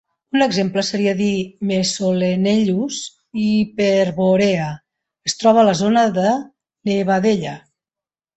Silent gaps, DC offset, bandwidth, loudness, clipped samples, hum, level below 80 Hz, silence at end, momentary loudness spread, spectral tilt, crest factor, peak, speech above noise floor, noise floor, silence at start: none; under 0.1%; 8.2 kHz; -18 LUFS; under 0.1%; none; -56 dBFS; 0.8 s; 11 LU; -5 dB/octave; 16 dB; -2 dBFS; over 73 dB; under -90 dBFS; 0.35 s